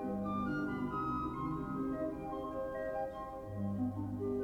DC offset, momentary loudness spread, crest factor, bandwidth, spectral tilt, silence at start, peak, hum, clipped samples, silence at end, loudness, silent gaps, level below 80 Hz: under 0.1%; 4 LU; 12 dB; 16.5 kHz; -9 dB/octave; 0 s; -26 dBFS; none; under 0.1%; 0 s; -39 LUFS; none; -56 dBFS